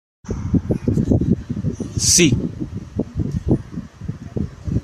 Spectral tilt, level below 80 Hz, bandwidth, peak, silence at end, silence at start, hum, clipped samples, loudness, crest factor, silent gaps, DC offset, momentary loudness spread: -4.5 dB/octave; -34 dBFS; 14.5 kHz; -2 dBFS; 0 s; 0.25 s; none; under 0.1%; -20 LUFS; 18 dB; none; under 0.1%; 17 LU